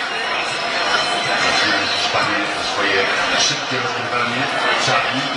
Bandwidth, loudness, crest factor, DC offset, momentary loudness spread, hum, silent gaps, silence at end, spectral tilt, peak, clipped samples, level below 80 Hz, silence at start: 11.5 kHz; -17 LUFS; 16 dB; under 0.1%; 4 LU; none; none; 0 s; -2 dB/octave; -4 dBFS; under 0.1%; -56 dBFS; 0 s